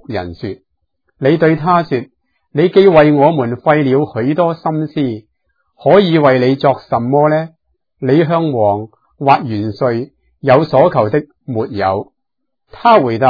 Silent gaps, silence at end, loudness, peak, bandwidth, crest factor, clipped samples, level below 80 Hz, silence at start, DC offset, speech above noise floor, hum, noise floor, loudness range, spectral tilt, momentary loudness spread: none; 0 s; -13 LUFS; 0 dBFS; 5.4 kHz; 14 dB; 0.1%; -50 dBFS; 0.1 s; under 0.1%; 65 dB; none; -77 dBFS; 3 LU; -9.5 dB/octave; 13 LU